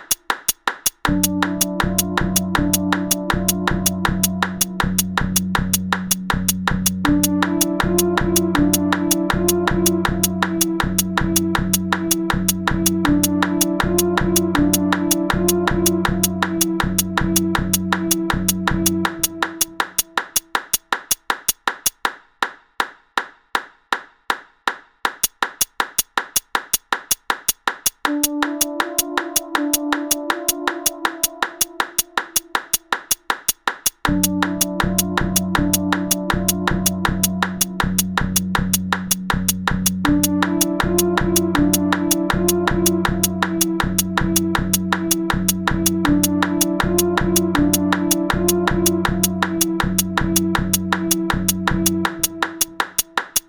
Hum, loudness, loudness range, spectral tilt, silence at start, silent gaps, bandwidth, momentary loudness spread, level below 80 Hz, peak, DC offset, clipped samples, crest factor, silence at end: none; -19 LUFS; 4 LU; -3.5 dB/octave; 0 s; none; over 20 kHz; 4 LU; -34 dBFS; -2 dBFS; under 0.1%; under 0.1%; 18 dB; 0.1 s